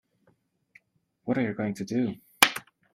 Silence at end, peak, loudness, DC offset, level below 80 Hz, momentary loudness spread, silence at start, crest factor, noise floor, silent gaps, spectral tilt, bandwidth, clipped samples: 0.35 s; 0 dBFS; -26 LUFS; under 0.1%; -70 dBFS; 13 LU; 1.25 s; 30 dB; -70 dBFS; none; -3 dB/octave; 16 kHz; under 0.1%